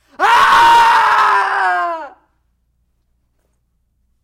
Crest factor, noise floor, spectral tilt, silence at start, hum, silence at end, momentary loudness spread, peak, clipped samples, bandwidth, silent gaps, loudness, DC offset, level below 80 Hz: 12 dB; -63 dBFS; -1 dB/octave; 0.2 s; none; 2.15 s; 11 LU; -2 dBFS; under 0.1%; 16.5 kHz; none; -11 LUFS; under 0.1%; -48 dBFS